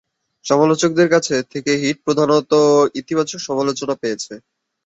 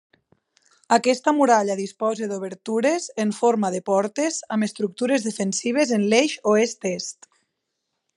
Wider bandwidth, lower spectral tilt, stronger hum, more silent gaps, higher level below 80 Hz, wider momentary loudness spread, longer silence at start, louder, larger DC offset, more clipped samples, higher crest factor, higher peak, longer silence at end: second, 8.2 kHz vs 11.5 kHz; about the same, -4.5 dB/octave vs -4 dB/octave; neither; neither; first, -60 dBFS vs -80 dBFS; about the same, 9 LU vs 9 LU; second, 0.45 s vs 0.9 s; first, -17 LUFS vs -22 LUFS; neither; neither; about the same, 16 dB vs 20 dB; about the same, -2 dBFS vs -2 dBFS; second, 0.5 s vs 1.05 s